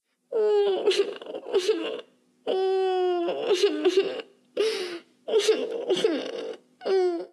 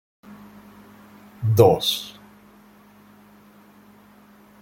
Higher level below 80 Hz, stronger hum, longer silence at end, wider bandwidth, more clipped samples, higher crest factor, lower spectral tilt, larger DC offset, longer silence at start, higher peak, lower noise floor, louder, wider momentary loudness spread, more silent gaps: second, -86 dBFS vs -58 dBFS; neither; second, 0.05 s vs 2.5 s; second, 12.5 kHz vs 16.5 kHz; neither; second, 16 dB vs 24 dB; second, -3 dB/octave vs -6 dB/octave; neither; about the same, 0.3 s vs 0.3 s; second, -10 dBFS vs -2 dBFS; second, -47 dBFS vs -51 dBFS; second, -26 LUFS vs -19 LUFS; second, 14 LU vs 28 LU; neither